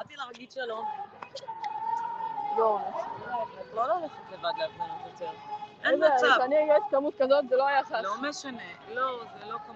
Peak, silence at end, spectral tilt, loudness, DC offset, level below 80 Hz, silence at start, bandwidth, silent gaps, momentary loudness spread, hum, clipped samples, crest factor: -10 dBFS; 0 s; -3.5 dB/octave; -28 LUFS; under 0.1%; -76 dBFS; 0 s; 8 kHz; none; 17 LU; none; under 0.1%; 18 dB